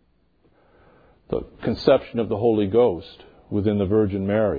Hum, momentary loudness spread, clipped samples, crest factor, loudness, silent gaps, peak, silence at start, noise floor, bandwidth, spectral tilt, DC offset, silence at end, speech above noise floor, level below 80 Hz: none; 11 LU; under 0.1%; 20 dB; -22 LUFS; none; -2 dBFS; 1.3 s; -62 dBFS; 5 kHz; -9.5 dB/octave; under 0.1%; 0 s; 42 dB; -50 dBFS